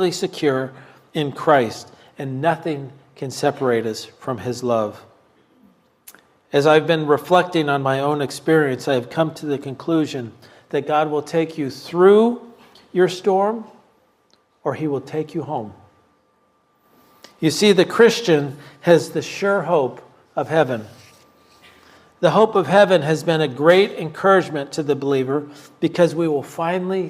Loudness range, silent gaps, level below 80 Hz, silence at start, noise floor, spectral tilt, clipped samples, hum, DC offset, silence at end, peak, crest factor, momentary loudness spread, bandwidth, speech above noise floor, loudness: 7 LU; none; -68 dBFS; 0 s; -62 dBFS; -5.5 dB/octave; under 0.1%; none; under 0.1%; 0 s; 0 dBFS; 20 dB; 14 LU; 15.5 kHz; 43 dB; -19 LUFS